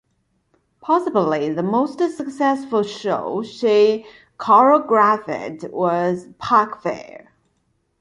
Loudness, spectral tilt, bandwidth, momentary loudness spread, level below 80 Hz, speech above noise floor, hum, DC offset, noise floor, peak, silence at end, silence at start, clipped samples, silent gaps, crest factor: -19 LUFS; -6.5 dB/octave; 11 kHz; 13 LU; -64 dBFS; 49 dB; none; under 0.1%; -67 dBFS; -2 dBFS; 0.85 s; 0.85 s; under 0.1%; none; 18 dB